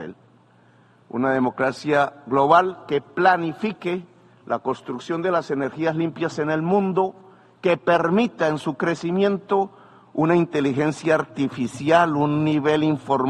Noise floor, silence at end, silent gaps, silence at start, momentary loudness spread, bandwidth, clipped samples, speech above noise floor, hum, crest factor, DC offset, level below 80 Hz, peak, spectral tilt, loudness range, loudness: -55 dBFS; 0 s; none; 0 s; 9 LU; 10.5 kHz; under 0.1%; 34 dB; none; 20 dB; under 0.1%; -64 dBFS; -2 dBFS; -6.5 dB/octave; 3 LU; -22 LUFS